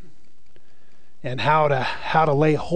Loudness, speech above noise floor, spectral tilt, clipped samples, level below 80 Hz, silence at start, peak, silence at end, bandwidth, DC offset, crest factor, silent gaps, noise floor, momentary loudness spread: -20 LUFS; 40 dB; -7 dB/octave; under 0.1%; -54 dBFS; 1.25 s; -4 dBFS; 0 s; 9.2 kHz; 3%; 18 dB; none; -60 dBFS; 11 LU